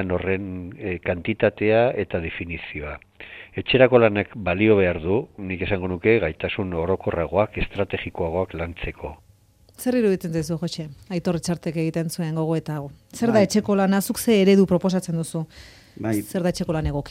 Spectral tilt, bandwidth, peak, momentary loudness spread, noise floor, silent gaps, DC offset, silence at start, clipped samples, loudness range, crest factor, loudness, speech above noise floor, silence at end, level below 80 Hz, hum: -6 dB/octave; 16 kHz; -2 dBFS; 14 LU; -55 dBFS; none; under 0.1%; 0 s; under 0.1%; 6 LU; 20 dB; -23 LUFS; 33 dB; 0 s; -44 dBFS; none